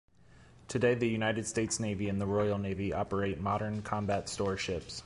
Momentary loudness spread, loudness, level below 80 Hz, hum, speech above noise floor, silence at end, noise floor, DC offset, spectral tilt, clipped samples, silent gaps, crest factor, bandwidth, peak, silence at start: 5 LU; -33 LUFS; -54 dBFS; none; 26 dB; 0 s; -59 dBFS; under 0.1%; -5 dB/octave; under 0.1%; none; 18 dB; 11.5 kHz; -16 dBFS; 0.4 s